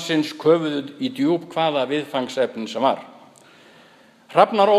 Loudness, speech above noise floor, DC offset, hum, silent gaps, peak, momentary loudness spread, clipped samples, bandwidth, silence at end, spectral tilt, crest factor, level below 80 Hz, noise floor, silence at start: -21 LUFS; 31 dB; under 0.1%; none; none; 0 dBFS; 8 LU; under 0.1%; 14 kHz; 0 s; -5.5 dB/octave; 20 dB; -76 dBFS; -51 dBFS; 0 s